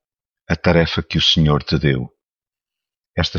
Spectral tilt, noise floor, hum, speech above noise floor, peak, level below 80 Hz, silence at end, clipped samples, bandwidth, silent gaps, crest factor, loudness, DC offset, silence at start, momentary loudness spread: -5.5 dB/octave; under -90 dBFS; none; over 74 dB; -2 dBFS; -34 dBFS; 0 s; under 0.1%; 7.2 kHz; none; 18 dB; -17 LUFS; under 0.1%; 0.5 s; 11 LU